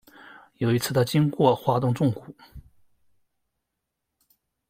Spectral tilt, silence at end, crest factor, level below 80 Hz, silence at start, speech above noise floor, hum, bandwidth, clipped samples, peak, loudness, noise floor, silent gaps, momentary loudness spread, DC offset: -6.5 dB/octave; 2.1 s; 22 dB; -58 dBFS; 0.6 s; 59 dB; none; 16 kHz; under 0.1%; -6 dBFS; -23 LUFS; -82 dBFS; none; 6 LU; under 0.1%